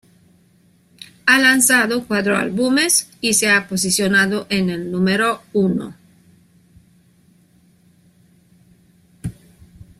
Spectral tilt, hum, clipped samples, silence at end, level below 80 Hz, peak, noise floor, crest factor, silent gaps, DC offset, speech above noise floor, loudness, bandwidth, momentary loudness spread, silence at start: -3 dB/octave; none; under 0.1%; 0.15 s; -54 dBFS; 0 dBFS; -55 dBFS; 20 dB; none; under 0.1%; 38 dB; -16 LUFS; 15 kHz; 12 LU; 1 s